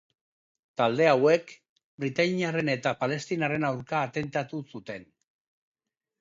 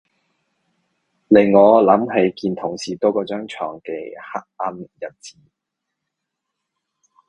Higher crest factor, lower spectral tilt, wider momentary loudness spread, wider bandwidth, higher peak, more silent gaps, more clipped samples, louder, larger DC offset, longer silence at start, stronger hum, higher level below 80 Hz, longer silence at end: about the same, 20 dB vs 20 dB; about the same, -6 dB/octave vs -6.5 dB/octave; second, 17 LU vs 20 LU; second, 7.8 kHz vs 10 kHz; second, -8 dBFS vs 0 dBFS; first, 1.69-1.76 s, 1.84-1.98 s vs none; neither; second, -27 LUFS vs -17 LUFS; neither; second, 0.8 s vs 1.3 s; neither; second, -68 dBFS vs -62 dBFS; second, 1.2 s vs 2 s